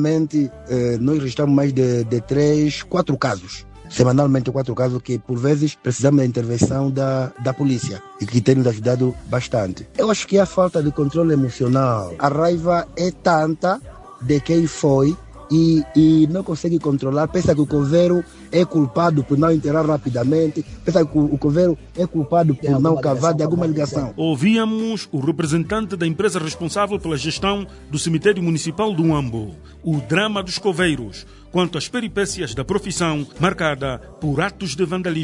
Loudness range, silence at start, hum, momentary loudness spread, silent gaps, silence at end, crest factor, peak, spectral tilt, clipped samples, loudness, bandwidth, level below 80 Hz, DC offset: 4 LU; 0 s; none; 7 LU; none; 0 s; 18 dB; 0 dBFS; -6.5 dB/octave; under 0.1%; -19 LUFS; 11 kHz; -44 dBFS; under 0.1%